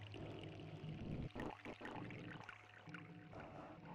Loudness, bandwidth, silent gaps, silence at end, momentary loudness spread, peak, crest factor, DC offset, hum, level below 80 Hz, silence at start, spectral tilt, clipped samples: -53 LUFS; 12 kHz; none; 0 s; 7 LU; -36 dBFS; 16 dB; under 0.1%; none; -66 dBFS; 0 s; -7 dB/octave; under 0.1%